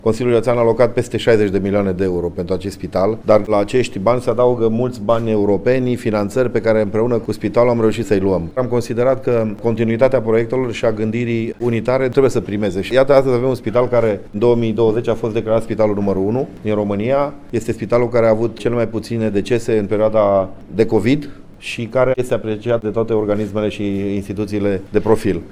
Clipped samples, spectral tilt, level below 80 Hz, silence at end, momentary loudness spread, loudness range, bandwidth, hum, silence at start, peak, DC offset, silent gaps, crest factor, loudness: under 0.1%; -7.5 dB/octave; -40 dBFS; 0 s; 6 LU; 2 LU; 15 kHz; none; 0.05 s; 0 dBFS; under 0.1%; none; 16 dB; -17 LUFS